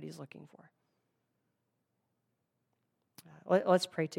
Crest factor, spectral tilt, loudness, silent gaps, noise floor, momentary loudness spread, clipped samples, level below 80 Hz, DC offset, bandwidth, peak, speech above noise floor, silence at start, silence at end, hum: 24 dB; -5.5 dB/octave; -30 LUFS; none; -82 dBFS; 23 LU; under 0.1%; under -90 dBFS; under 0.1%; 16 kHz; -14 dBFS; 49 dB; 0 s; 0 s; none